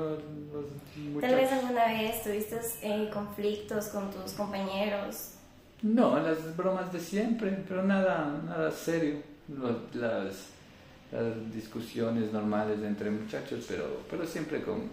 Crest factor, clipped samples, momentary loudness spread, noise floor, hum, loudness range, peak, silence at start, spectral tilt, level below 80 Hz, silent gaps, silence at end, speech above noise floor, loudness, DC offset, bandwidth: 20 dB; under 0.1%; 13 LU; -54 dBFS; none; 5 LU; -14 dBFS; 0 s; -5.5 dB/octave; -62 dBFS; none; 0 s; 22 dB; -32 LUFS; under 0.1%; 16 kHz